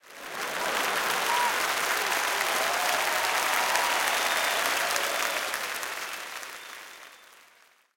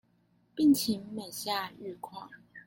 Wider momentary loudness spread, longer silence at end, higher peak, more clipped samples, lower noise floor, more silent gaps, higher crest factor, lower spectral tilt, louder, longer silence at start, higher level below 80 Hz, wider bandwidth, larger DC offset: second, 14 LU vs 20 LU; first, 0.7 s vs 0.05 s; first, -4 dBFS vs -14 dBFS; neither; second, -60 dBFS vs -69 dBFS; neither; first, 24 dB vs 18 dB; second, 0.5 dB/octave vs -4 dB/octave; first, -26 LUFS vs -30 LUFS; second, 0.05 s vs 0.55 s; about the same, -68 dBFS vs -70 dBFS; about the same, 17 kHz vs 17 kHz; neither